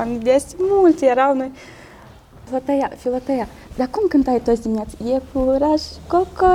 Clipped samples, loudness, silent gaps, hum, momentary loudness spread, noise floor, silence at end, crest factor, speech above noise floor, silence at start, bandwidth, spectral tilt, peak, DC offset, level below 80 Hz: under 0.1%; -19 LUFS; none; none; 10 LU; -43 dBFS; 0 s; 16 dB; 25 dB; 0 s; 15 kHz; -6 dB/octave; -4 dBFS; under 0.1%; -40 dBFS